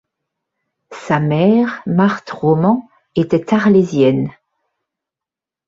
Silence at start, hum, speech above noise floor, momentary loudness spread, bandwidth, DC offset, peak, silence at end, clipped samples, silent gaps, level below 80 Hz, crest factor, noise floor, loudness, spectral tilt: 0.9 s; none; 73 dB; 8 LU; 7.8 kHz; under 0.1%; -2 dBFS; 1.35 s; under 0.1%; none; -56 dBFS; 14 dB; -87 dBFS; -15 LUFS; -8 dB/octave